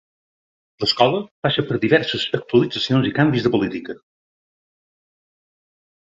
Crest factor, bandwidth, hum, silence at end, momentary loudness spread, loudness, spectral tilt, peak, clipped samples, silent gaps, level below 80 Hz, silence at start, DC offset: 22 dB; 7.8 kHz; none; 2.05 s; 8 LU; -19 LUFS; -6.5 dB/octave; 0 dBFS; under 0.1%; 1.31-1.43 s; -56 dBFS; 0.8 s; under 0.1%